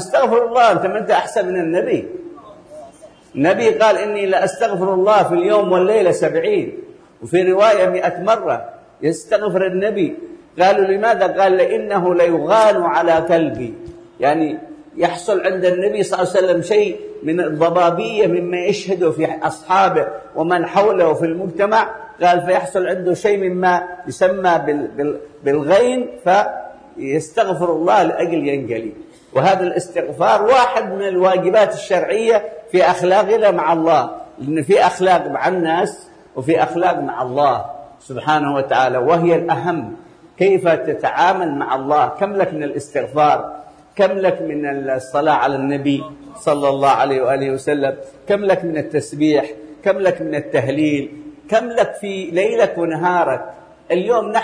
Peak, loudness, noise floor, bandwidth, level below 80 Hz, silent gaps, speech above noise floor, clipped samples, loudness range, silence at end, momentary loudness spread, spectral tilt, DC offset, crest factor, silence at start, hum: -2 dBFS; -16 LUFS; -42 dBFS; 10.5 kHz; -56 dBFS; none; 27 dB; under 0.1%; 3 LU; 0 s; 10 LU; -5.5 dB/octave; under 0.1%; 14 dB; 0 s; none